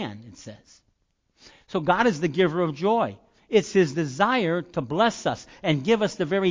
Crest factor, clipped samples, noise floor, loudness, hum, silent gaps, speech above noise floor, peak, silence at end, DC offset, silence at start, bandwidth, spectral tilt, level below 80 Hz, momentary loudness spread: 18 dB; under 0.1%; -70 dBFS; -24 LUFS; none; none; 46 dB; -6 dBFS; 0 s; under 0.1%; 0 s; 7.6 kHz; -5.5 dB/octave; -60 dBFS; 10 LU